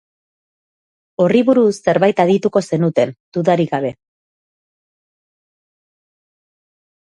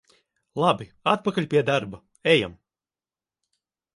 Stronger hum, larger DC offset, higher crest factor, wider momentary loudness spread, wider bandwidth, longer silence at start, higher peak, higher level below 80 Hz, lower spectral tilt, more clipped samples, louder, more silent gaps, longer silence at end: neither; neither; about the same, 18 dB vs 22 dB; second, 7 LU vs 12 LU; about the same, 11.5 kHz vs 11.5 kHz; first, 1.2 s vs 0.55 s; first, 0 dBFS vs -4 dBFS; about the same, -62 dBFS vs -60 dBFS; first, -7 dB/octave vs -5.5 dB/octave; neither; first, -16 LUFS vs -23 LUFS; first, 3.20-3.32 s vs none; first, 3.15 s vs 1.4 s